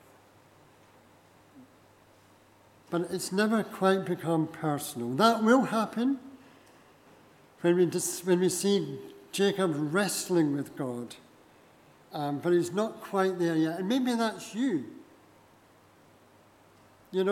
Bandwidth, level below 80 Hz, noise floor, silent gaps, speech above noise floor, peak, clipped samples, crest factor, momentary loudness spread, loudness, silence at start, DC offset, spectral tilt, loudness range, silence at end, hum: 17 kHz; -78 dBFS; -59 dBFS; none; 32 dB; -8 dBFS; under 0.1%; 22 dB; 11 LU; -29 LUFS; 1.55 s; under 0.1%; -5 dB/octave; 6 LU; 0 s; none